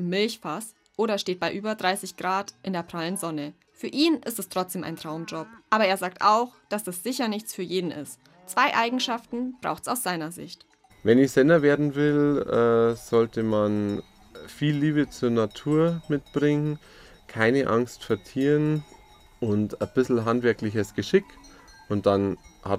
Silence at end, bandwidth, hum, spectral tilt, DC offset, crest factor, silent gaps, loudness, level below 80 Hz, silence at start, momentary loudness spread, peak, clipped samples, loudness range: 0 s; 16 kHz; none; -5.5 dB/octave; under 0.1%; 20 dB; none; -25 LUFS; -60 dBFS; 0 s; 12 LU; -6 dBFS; under 0.1%; 6 LU